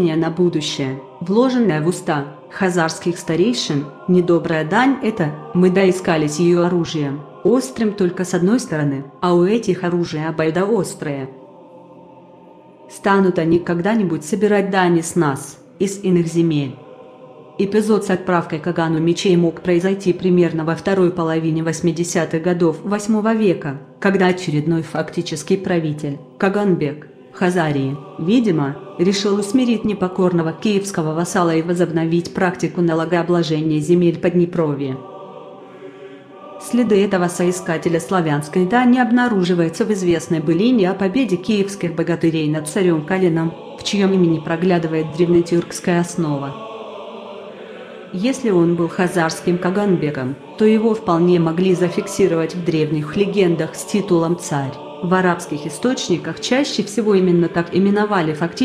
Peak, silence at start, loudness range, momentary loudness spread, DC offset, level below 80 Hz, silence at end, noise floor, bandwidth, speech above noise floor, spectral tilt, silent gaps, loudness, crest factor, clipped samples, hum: -2 dBFS; 0 s; 4 LU; 10 LU; under 0.1%; -56 dBFS; 0 s; -43 dBFS; 13.5 kHz; 26 dB; -6 dB/octave; none; -18 LUFS; 16 dB; under 0.1%; none